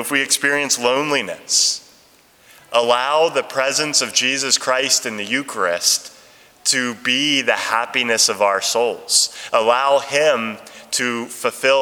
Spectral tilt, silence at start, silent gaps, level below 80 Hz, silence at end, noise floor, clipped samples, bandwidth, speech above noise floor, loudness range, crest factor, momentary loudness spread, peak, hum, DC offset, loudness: -0.5 dB/octave; 0 s; none; -70 dBFS; 0 s; -52 dBFS; under 0.1%; over 20 kHz; 33 dB; 2 LU; 18 dB; 6 LU; 0 dBFS; none; under 0.1%; -17 LUFS